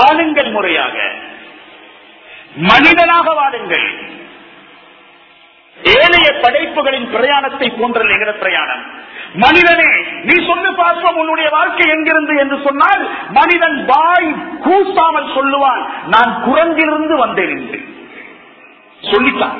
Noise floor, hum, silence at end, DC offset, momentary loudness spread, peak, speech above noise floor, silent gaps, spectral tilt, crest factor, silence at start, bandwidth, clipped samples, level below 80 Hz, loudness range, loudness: -44 dBFS; none; 0 s; under 0.1%; 12 LU; 0 dBFS; 32 dB; none; -5.5 dB/octave; 12 dB; 0 s; 6 kHz; 0.2%; -48 dBFS; 3 LU; -11 LUFS